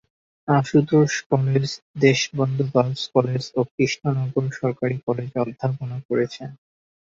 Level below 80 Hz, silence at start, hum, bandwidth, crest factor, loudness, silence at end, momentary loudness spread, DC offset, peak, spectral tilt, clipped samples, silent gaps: -60 dBFS; 0.45 s; none; 7.6 kHz; 18 dB; -22 LUFS; 0.5 s; 9 LU; under 0.1%; -4 dBFS; -6 dB/octave; under 0.1%; 1.26-1.30 s, 1.82-1.94 s, 3.71-3.78 s, 5.03-5.07 s, 6.05-6.09 s